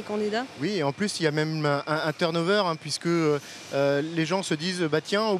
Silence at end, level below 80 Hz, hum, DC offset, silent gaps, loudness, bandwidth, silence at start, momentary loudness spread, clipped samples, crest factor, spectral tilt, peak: 0 s; -76 dBFS; none; under 0.1%; none; -26 LUFS; 14 kHz; 0 s; 5 LU; under 0.1%; 18 dB; -5 dB/octave; -8 dBFS